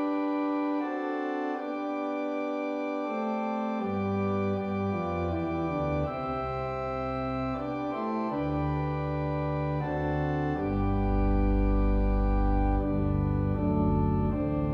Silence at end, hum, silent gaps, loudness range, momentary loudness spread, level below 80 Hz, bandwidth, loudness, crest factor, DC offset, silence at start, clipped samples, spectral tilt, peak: 0 s; none; none; 4 LU; 5 LU; -34 dBFS; 6.2 kHz; -30 LUFS; 14 dB; under 0.1%; 0 s; under 0.1%; -9.5 dB/octave; -14 dBFS